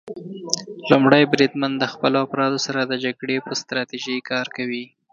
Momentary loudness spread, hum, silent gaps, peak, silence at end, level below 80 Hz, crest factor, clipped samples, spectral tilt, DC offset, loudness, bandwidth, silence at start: 12 LU; none; none; 0 dBFS; 0.25 s; -66 dBFS; 22 dB; under 0.1%; -4.5 dB/octave; under 0.1%; -21 LUFS; 8 kHz; 0.05 s